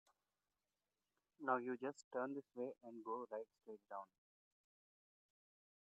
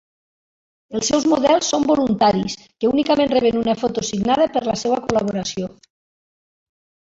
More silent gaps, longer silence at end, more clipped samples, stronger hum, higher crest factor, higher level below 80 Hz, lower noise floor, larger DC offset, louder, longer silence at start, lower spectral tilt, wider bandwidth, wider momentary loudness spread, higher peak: first, 2.04-2.11 s vs none; first, 1.85 s vs 1.4 s; neither; first, 50 Hz at -95 dBFS vs none; first, 26 dB vs 18 dB; second, under -90 dBFS vs -52 dBFS; about the same, under -90 dBFS vs under -90 dBFS; neither; second, -48 LUFS vs -19 LUFS; first, 1.4 s vs 0.9 s; about the same, -5 dB/octave vs -4.5 dB/octave; about the same, 8 kHz vs 8 kHz; first, 13 LU vs 8 LU; second, -24 dBFS vs -2 dBFS